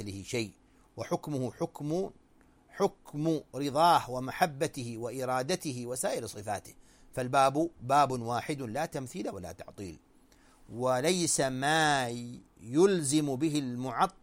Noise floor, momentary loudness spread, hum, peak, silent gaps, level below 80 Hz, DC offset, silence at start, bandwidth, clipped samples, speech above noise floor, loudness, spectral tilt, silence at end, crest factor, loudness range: -62 dBFS; 15 LU; none; -10 dBFS; none; -62 dBFS; under 0.1%; 0 s; 16.5 kHz; under 0.1%; 32 dB; -31 LUFS; -4.5 dB/octave; 0.1 s; 20 dB; 6 LU